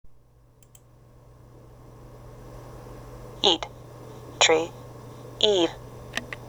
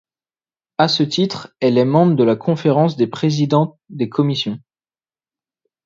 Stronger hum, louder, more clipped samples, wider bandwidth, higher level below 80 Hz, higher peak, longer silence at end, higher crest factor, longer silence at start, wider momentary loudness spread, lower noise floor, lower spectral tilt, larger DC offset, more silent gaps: neither; second, -23 LUFS vs -17 LUFS; neither; first, over 20 kHz vs 7.6 kHz; first, -52 dBFS vs -62 dBFS; about the same, -2 dBFS vs 0 dBFS; second, 0 s vs 1.25 s; first, 28 dB vs 18 dB; second, 0.05 s vs 0.8 s; first, 25 LU vs 10 LU; second, -56 dBFS vs under -90 dBFS; second, -2.5 dB/octave vs -7 dB/octave; neither; neither